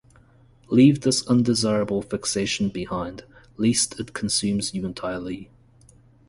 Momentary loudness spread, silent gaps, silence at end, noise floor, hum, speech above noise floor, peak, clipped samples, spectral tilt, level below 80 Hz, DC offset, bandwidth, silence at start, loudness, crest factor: 14 LU; none; 0.85 s; -54 dBFS; none; 32 dB; -4 dBFS; under 0.1%; -4.5 dB/octave; -52 dBFS; under 0.1%; 11.5 kHz; 0.7 s; -23 LUFS; 20 dB